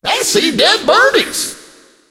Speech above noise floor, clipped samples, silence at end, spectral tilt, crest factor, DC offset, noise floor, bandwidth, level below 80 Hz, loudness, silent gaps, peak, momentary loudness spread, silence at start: 32 dB; under 0.1%; 0.5 s; -1.5 dB/octave; 14 dB; under 0.1%; -43 dBFS; 16.5 kHz; -50 dBFS; -11 LUFS; none; 0 dBFS; 9 LU; 0.05 s